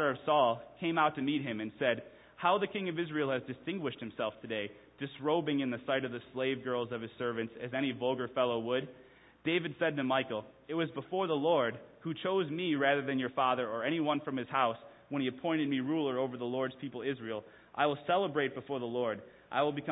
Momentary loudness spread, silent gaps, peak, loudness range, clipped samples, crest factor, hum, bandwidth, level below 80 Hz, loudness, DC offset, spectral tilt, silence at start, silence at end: 9 LU; none; -14 dBFS; 3 LU; under 0.1%; 20 dB; none; 3.9 kHz; -74 dBFS; -34 LUFS; under 0.1%; -2 dB/octave; 0 s; 0 s